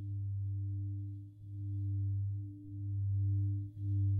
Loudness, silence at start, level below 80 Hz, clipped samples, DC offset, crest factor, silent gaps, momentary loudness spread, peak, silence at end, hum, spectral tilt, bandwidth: -39 LUFS; 0 s; -64 dBFS; under 0.1%; under 0.1%; 10 dB; none; 11 LU; -26 dBFS; 0 s; none; -13 dB/octave; 0.6 kHz